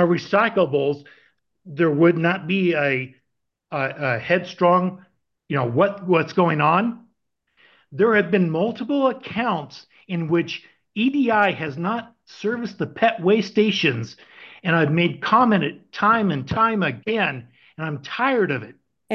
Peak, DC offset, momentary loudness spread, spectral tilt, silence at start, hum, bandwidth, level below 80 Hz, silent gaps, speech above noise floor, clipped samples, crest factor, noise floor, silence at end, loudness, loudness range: -4 dBFS; under 0.1%; 12 LU; -7 dB/octave; 0 s; none; 6.8 kHz; -60 dBFS; none; 56 dB; under 0.1%; 18 dB; -77 dBFS; 0 s; -21 LUFS; 3 LU